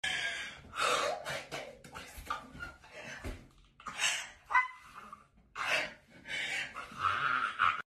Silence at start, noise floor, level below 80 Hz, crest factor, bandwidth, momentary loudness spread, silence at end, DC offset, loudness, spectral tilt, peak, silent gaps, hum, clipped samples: 0.05 s; -58 dBFS; -60 dBFS; 22 dB; 13.5 kHz; 18 LU; 0.15 s; under 0.1%; -34 LUFS; -1 dB/octave; -16 dBFS; none; none; under 0.1%